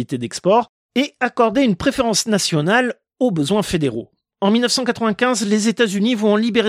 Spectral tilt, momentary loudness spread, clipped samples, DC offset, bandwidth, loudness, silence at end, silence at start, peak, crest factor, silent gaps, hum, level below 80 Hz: -4.5 dB/octave; 6 LU; under 0.1%; under 0.1%; 15.5 kHz; -18 LUFS; 0 s; 0 s; -2 dBFS; 16 dB; 0.69-0.89 s; none; -48 dBFS